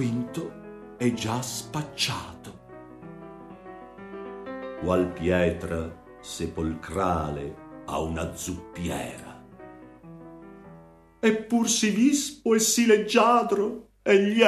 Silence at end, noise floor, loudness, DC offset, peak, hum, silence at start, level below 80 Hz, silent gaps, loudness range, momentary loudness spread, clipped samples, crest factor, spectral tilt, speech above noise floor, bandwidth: 0 s; -51 dBFS; -25 LUFS; under 0.1%; -4 dBFS; none; 0 s; -50 dBFS; none; 12 LU; 24 LU; under 0.1%; 22 dB; -4 dB/octave; 27 dB; 14 kHz